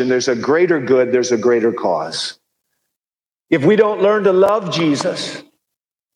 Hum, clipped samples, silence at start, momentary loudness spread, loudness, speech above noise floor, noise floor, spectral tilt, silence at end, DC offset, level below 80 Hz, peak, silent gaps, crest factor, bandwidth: none; under 0.1%; 0 s; 10 LU; -16 LUFS; over 75 dB; under -90 dBFS; -5 dB/octave; 0.75 s; under 0.1%; -64 dBFS; 0 dBFS; none; 16 dB; 11 kHz